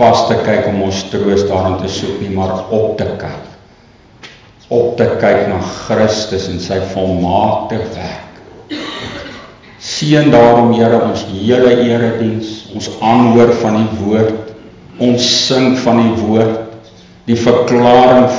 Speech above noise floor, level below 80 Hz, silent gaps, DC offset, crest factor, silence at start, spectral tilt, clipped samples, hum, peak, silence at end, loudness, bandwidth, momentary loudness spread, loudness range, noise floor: 32 dB; -38 dBFS; none; under 0.1%; 12 dB; 0 s; -5.5 dB/octave; under 0.1%; none; 0 dBFS; 0 s; -12 LUFS; 7.6 kHz; 16 LU; 7 LU; -43 dBFS